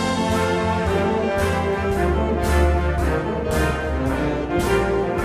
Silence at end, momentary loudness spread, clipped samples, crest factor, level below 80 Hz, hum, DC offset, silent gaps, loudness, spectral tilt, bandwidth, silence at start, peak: 0 s; 3 LU; under 0.1%; 14 dB; -26 dBFS; none; under 0.1%; none; -21 LUFS; -6 dB/octave; 15.5 kHz; 0 s; -6 dBFS